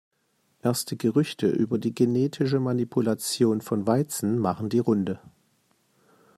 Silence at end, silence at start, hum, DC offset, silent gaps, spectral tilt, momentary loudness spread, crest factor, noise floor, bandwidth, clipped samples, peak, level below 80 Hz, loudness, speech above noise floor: 1.1 s; 0.65 s; none; under 0.1%; none; -6 dB/octave; 3 LU; 18 dB; -70 dBFS; 15 kHz; under 0.1%; -8 dBFS; -68 dBFS; -25 LUFS; 45 dB